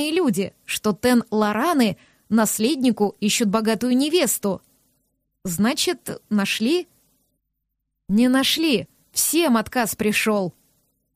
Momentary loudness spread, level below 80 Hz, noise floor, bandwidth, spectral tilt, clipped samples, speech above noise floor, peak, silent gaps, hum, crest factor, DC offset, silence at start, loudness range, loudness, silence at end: 8 LU; -58 dBFS; -77 dBFS; 15.5 kHz; -3.5 dB/octave; under 0.1%; 57 dB; -6 dBFS; none; none; 16 dB; under 0.1%; 0 s; 4 LU; -21 LUFS; 0.65 s